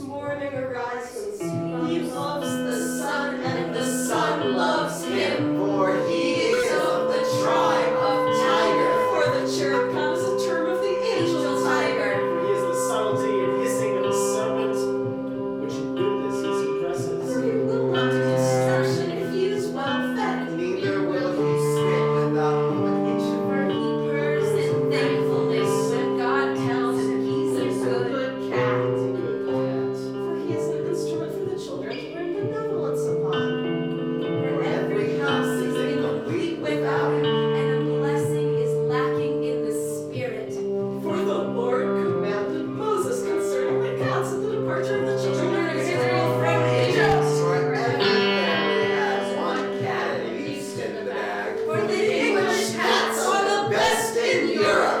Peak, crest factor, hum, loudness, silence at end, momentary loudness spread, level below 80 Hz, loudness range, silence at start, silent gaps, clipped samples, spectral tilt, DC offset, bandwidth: -6 dBFS; 16 dB; none; -23 LUFS; 0 s; 7 LU; -62 dBFS; 5 LU; 0 s; none; under 0.1%; -5 dB/octave; under 0.1%; 17.5 kHz